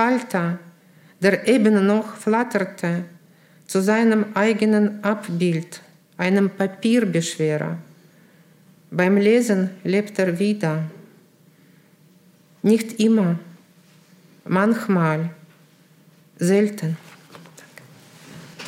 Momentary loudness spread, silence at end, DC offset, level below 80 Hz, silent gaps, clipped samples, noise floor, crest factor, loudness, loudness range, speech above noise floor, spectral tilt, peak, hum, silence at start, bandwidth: 12 LU; 0 s; under 0.1%; -72 dBFS; none; under 0.1%; -54 dBFS; 18 dB; -20 LUFS; 4 LU; 34 dB; -6.5 dB/octave; -4 dBFS; none; 0 s; 15.5 kHz